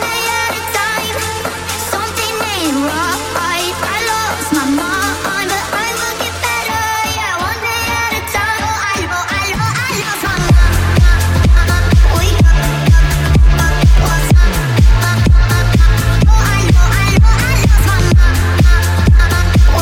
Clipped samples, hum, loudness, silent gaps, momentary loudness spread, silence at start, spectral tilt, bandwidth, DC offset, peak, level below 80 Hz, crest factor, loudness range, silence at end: under 0.1%; none; -13 LUFS; none; 5 LU; 0 s; -4.5 dB/octave; 17 kHz; under 0.1%; 0 dBFS; -14 dBFS; 10 dB; 5 LU; 0 s